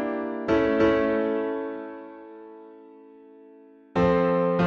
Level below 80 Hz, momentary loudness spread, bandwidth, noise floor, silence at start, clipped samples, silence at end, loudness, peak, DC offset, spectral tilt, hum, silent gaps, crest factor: -50 dBFS; 23 LU; 7 kHz; -51 dBFS; 0 s; under 0.1%; 0 s; -24 LUFS; -10 dBFS; under 0.1%; -8 dB/octave; none; none; 16 dB